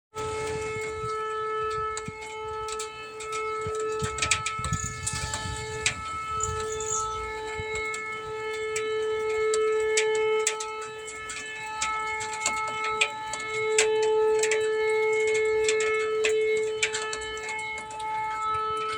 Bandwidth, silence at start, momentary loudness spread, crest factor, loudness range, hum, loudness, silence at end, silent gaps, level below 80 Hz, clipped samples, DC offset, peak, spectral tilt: 18 kHz; 0.15 s; 10 LU; 22 dB; 6 LU; none; -28 LUFS; 0 s; none; -52 dBFS; under 0.1%; under 0.1%; -6 dBFS; -2 dB/octave